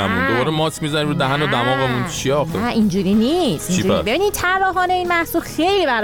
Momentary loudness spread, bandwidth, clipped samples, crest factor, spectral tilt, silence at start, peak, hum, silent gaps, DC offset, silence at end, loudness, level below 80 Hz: 3 LU; 19.5 kHz; under 0.1%; 12 dB; -5 dB/octave; 0 s; -6 dBFS; none; none; under 0.1%; 0 s; -18 LUFS; -40 dBFS